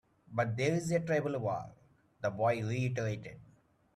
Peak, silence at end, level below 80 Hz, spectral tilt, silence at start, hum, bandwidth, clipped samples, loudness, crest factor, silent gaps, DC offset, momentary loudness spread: -18 dBFS; 0.55 s; -68 dBFS; -6.5 dB/octave; 0.3 s; none; 12.5 kHz; under 0.1%; -34 LUFS; 16 dB; none; under 0.1%; 9 LU